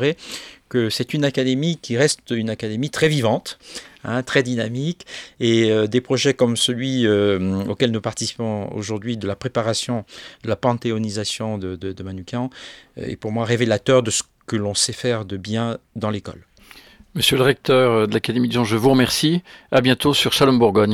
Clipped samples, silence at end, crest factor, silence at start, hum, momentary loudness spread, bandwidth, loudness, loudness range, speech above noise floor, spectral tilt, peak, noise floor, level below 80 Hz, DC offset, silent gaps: under 0.1%; 0 s; 20 dB; 0 s; none; 14 LU; 16.5 kHz; -20 LUFS; 7 LU; 27 dB; -4.5 dB/octave; 0 dBFS; -47 dBFS; -54 dBFS; under 0.1%; none